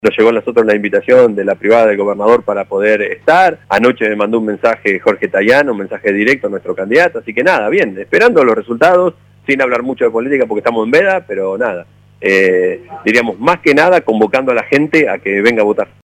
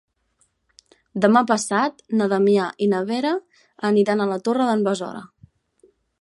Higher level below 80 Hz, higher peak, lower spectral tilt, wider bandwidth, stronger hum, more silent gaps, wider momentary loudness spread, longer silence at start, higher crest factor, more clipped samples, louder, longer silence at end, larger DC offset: first, -54 dBFS vs -68 dBFS; about the same, 0 dBFS vs -2 dBFS; about the same, -5.5 dB/octave vs -5.5 dB/octave; about the same, 12 kHz vs 11.5 kHz; first, 50 Hz at -45 dBFS vs none; neither; second, 7 LU vs 10 LU; second, 0.05 s vs 1.15 s; second, 12 dB vs 20 dB; neither; first, -12 LUFS vs -20 LUFS; second, 0.25 s vs 0.95 s; neither